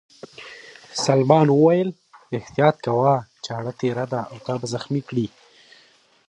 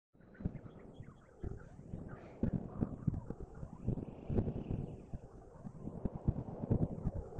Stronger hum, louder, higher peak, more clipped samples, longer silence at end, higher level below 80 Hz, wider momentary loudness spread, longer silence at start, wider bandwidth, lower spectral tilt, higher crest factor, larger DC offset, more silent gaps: neither; first, -21 LUFS vs -42 LUFS; first, -2 dBFS vs -20 dBFS; neither; first, 1 s vs 0 s; second, -64 dBFS vs -50 dBFS; about the same, 16 LU vs 15 LU; first, 0.4 s vs 0.2 s; first, 10.5 kHz vs 8.2 kHz; second, -6.5 dB/octave vs -11 dB/octave; about the same, 20 dB vs 22 dB; neither; neither